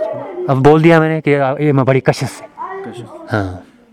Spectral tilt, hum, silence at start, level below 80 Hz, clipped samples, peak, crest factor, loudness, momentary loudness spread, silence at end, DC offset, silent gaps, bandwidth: -7.5 dB/octave; none; 0 s; -46 dBFS; 0.4%; 0 dBFS; 14 dB; -13 LUFS; 19 LU; 0.3 s; under 0.1%; none; 13 kHz